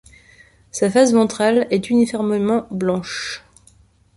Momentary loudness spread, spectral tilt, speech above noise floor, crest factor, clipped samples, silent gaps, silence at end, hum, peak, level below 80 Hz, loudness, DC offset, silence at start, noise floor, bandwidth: 12 LU; -5 dB/octave; 36 dB; 16 dB; under 0.1%; none; 0.8 s; none; -2 dBFS; -56 dBFS; -18 LUFS; under 0.1%; 0.75 s; -53 dBFS; 11.5 kHz